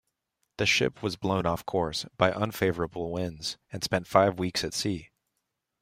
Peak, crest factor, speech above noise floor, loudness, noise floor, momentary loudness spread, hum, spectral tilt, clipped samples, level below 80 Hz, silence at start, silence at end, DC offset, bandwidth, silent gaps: -6 dBFS; 24 dB; 54 dB; -28 LUFS; -82 dBFS; 9 LU; none; -4.5 dB/octave; under 0.1%; -56 dBFS; 0.6 s; 0.75 s; under 0.1%; 16 kHz; none